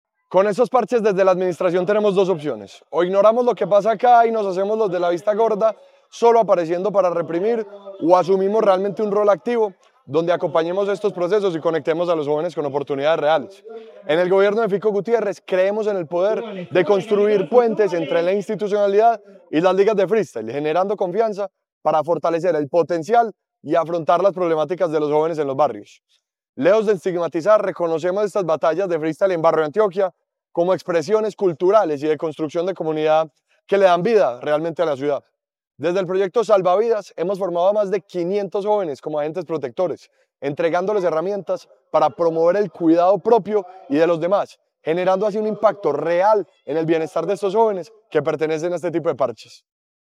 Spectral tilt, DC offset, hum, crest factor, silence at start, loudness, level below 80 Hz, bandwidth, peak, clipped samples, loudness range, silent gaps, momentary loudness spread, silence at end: -6.5 dB/octave; under 0.1%; none; 18 dB; 0.3 s; -19 LUFS; -80 dBFS; 11 kHz; 0 dBFS; under 0.1%; 3 LU; 21.72-21.81 s, 26.49-26.53 s; 8 LU; 0.7 s